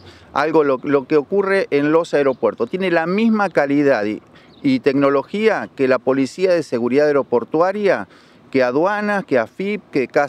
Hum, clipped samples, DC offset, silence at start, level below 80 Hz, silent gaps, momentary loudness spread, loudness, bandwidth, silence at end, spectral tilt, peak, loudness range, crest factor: none; under 0.1%; under 0.1%; 0.05 s; -62 dBFS; none; 6 LU; -18 LUFS; 10.5 kHz; 0 s; -6.5 dB/octave; -2 dBFS; 1 LU; 14 dB